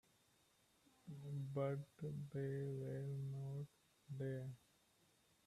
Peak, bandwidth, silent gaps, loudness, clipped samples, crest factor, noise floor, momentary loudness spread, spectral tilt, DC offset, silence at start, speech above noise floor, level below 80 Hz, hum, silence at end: -32 dBFS; 13 kHz; none; -48 LUFS; under 0.1%; 18 dB; -77 dBFS; 12 LU; -8.5 dB/octave; under 0.1%; 1.05 s; 31 dB; -82 dBFS; none; 0.9 s